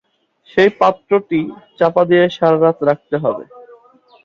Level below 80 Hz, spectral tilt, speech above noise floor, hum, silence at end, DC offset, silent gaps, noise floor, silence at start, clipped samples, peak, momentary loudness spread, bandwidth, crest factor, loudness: -58 dBFS; -7.5 dB/octave; 37 dB; none; 0.65 s; under 0.1%; none; -52 dBFS; 0.55 s; under 0.1%; -2 dBFS; 9 LU; 7.2 kHz; 14 dB; -15 LUFS